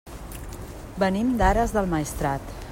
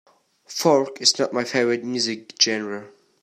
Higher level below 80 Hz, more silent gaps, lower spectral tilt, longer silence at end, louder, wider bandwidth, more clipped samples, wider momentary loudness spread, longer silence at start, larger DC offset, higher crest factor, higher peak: first, -34 dBFS vs -74 dBFS; neither; first, -6 dB/octave vs -2.5 dB/octave; second, 0 s vs 0.35 s; second, -24 LUFS vs -21 LUFS; about the same, 16.5 kHz vs 16 kHz; neither; first, 17 LU vs 12 LU; second, 0.05 s vs 0.5 s; neither; about the same, 18 dB vs 22 dB; second, -6 dBFS vs -2 dBFS